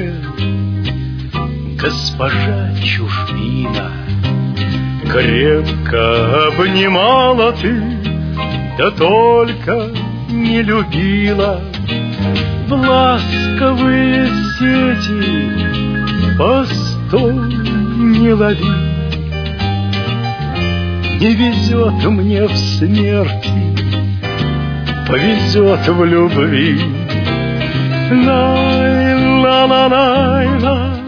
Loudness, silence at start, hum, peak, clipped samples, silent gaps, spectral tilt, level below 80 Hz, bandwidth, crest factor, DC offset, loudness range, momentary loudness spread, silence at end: -13 LUFS; 0 s; none; 0 dBFS; under 0.1%; none; -7 dB/octave; -30 dBFS; 5.4 kHz; 12 dB; under 0.1%; 4 LU; 8 LU; 0 s